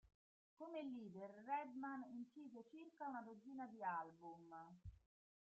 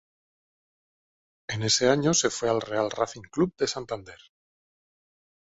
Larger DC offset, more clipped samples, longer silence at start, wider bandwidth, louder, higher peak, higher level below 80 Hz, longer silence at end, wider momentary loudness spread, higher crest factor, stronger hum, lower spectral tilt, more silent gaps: neither; neither; second, 0.05 s vs 1.5 s; about the same, 7.6 kHz vs 8 kHz; second, -53 LUFS vs -26 LUFS; second, -34 dBFS vs -8 dBFS; second, -78 dBFS vs -60 dBFS; second, 0.5 s vs 1.35 s; about the same, 13 LU vs 14 LU; about the same, 18 dB vs 22 dB; neither; first, -5 dB/octave vs -3.5 dB/octave; first, 0.15-0.57 s vs none